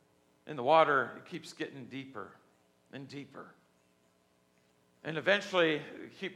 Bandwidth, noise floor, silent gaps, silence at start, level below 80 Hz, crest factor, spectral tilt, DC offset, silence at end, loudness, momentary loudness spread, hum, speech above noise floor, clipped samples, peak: 12.5 kHz; -71 dBFS; none; 0.45 s; -86 dBFS; 24 dB; -5 dB/octave; under 0.1%; 0 s; -31 LUFS; 23 LU; none; 38 dB; under 0.1%; -12 dBFS